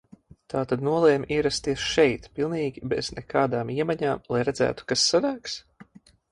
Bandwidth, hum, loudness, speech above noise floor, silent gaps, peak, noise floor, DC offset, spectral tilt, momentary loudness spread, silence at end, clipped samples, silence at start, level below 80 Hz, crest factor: 11.5 kHz; none; -25 LUFS; 27 dB; none; -6 dBFS; -52 dBFS; under 0.1%; -4 dB/octave; 8 LU; 0.5 s; under 0.1%; 0.5 s; -52 dBFS; 18 dB